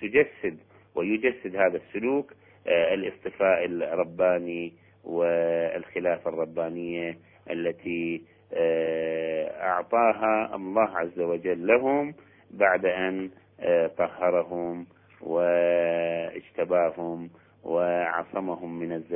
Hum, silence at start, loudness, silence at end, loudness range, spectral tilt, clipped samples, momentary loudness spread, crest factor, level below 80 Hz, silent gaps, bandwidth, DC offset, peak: none; 0 s; -27 LUFS; 0 s; 4 LU; -9.5 dB/octave; under 0.1%; 12 LU; 20 dB; -66 dBFS; none; 3.5 kHz; under 0.1%; -6 dBFS